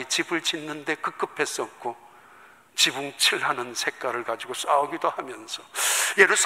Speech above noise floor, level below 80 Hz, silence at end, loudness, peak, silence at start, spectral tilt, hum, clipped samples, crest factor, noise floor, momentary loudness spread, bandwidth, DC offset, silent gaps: 27 dB; -78 dBFS; 0 s; -25 LUFS; -2 dBFS; 0 s; -0.5 dB/octave; none; under 0.1%; 24 dB; -52 dBFS; 13 LU; 16 kHz; under 0.1%; none